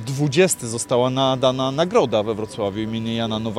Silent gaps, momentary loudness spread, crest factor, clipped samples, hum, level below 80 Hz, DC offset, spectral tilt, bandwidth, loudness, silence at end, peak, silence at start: none; 7 LU; 18 dB; under 0.1%; none; -52 dBFS; under 0.1%; -4.5 dB/octave; 16 kHz; -20 LUFS; 0 s; -2 dBFS; 0 s